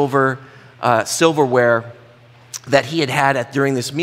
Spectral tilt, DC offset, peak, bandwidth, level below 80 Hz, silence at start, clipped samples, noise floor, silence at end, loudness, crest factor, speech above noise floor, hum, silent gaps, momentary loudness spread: -4.5 dB/octave; under 0.1%; 0 dBFS; 16.5 kHz; -64 dBFS; 0 s; under 0.1%; -46 dBFS; 0 s; -17 LUFS; 18 dB; 29 dB; none; none; 8 LU